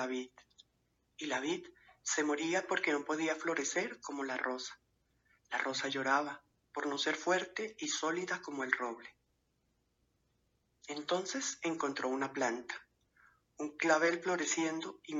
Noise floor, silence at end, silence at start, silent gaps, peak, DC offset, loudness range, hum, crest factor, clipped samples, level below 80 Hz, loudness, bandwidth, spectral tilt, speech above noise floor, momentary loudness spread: -79 dBFS; 0 s; 0 s; none; -12 dBFS; under 0.1%; 5 LU; none; 26 dB; under 0.1%; -82 dBFS; -36 LUFS; 8 kHz; -2.5 dB/octave; 43 dB; 12 LU